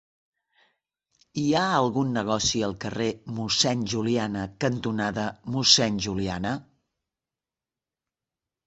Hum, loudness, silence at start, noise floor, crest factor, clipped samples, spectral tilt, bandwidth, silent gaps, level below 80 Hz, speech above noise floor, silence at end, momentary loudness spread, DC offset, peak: none; -25 LUFS; 1.35 s; under -90 dBFS; 26 dB; under 0.1%; -3.5 dB/octave; 8.2 kHz; none; -54 dBFS; over 65 dB; 2.05 s; 12 LU; under 0.1%; -2 dBFS